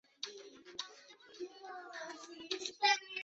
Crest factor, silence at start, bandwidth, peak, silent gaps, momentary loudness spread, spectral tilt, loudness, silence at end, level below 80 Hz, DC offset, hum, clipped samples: 24 dB; 0.2 s; 8 kHz; -16 dBFS; none; 19 LU; 3.5 dB/octave; -39 LUFS; 0 s; -88 dBFS; under 0.1%; none; under 0.1%